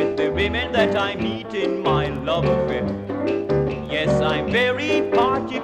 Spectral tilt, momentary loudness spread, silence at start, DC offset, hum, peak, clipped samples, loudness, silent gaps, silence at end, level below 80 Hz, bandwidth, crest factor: -6.5 dB/octave; 5 LU; 0 s; under 0.1%; none; -6 dBFS; under 0.1%; -21 LUFS; none; 0 s; -40 dBFS; 9.8 kHz; 16 dB